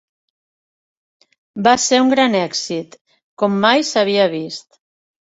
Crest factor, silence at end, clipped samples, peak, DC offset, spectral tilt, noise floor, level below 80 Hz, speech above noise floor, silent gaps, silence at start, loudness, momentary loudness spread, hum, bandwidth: 18 dB; 0.6 s; under 0.1%; 0 dBFS; under 0.1%; -3.5 dB/octave; under -90 dBFS; -62 dBFS; over 74 dB; 3.01-3.05 s, 3.23-3.37 s; 1.55 s; -16 LUFS; 14 LU; none; 8 kHz